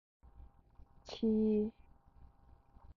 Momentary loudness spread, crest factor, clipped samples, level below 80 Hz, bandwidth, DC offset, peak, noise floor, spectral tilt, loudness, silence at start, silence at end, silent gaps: 19 LU; 14 dB; under 0.1%; -62 dBFS; 6.8 kHz; under 0.1%; -24 dBFS; -63 dBFS; -8 dB/octave; -35 LUFS; 0.4 s; 1.25 s; none